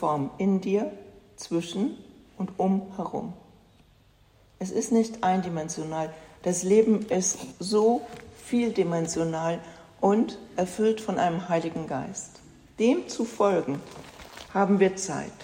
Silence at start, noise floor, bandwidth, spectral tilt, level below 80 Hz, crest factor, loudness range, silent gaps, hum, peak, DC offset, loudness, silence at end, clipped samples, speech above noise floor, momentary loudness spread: 0 s; -59 dBFS; 16 kHz; -5.5 dB/octave; -62 dBFS; 18 dB; 6 LU; none; none; -8 dBFS; under 0.1%; -27 LUFS; 0 s; under 0.1%; 33 dB; 14 LU